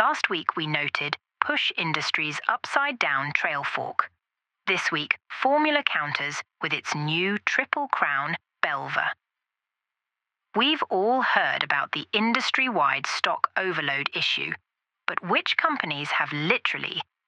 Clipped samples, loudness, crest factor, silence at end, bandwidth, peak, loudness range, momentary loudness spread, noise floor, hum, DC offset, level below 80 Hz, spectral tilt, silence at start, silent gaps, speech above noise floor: under 0.1%; -25 LUFS; 24 dB; 0.25 s; 11 kHz; -4 dBFS; 3 LU; 7 LU; -87 dBFS; none; under 0.1%; -82 dBFS; -3.5 dB/octave; 0 s; none; 61 dB